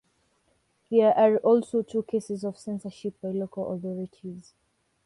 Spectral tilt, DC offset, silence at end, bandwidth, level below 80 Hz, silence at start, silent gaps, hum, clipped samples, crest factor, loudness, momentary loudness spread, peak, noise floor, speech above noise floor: -7.5 dB/octave; under 0.1%; 0.65 s; 11.5 kHz; -72 dBFS; 0.9 s; none; none; under 0.1%; 18 dB; -26 LUFS; 17 LU; -8 dBFS; -70 dBFS; 44 dB